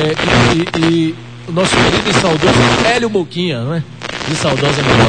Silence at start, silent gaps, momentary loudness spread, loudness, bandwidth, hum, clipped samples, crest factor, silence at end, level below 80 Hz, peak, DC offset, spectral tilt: 0 s; none; 10 LU; -13 LUFS; 9.6 kHz; none; under 0.1%; 14 dB; 0 s; -34 dBFS; 0 dBFS; 0.6%; -5 dB/octave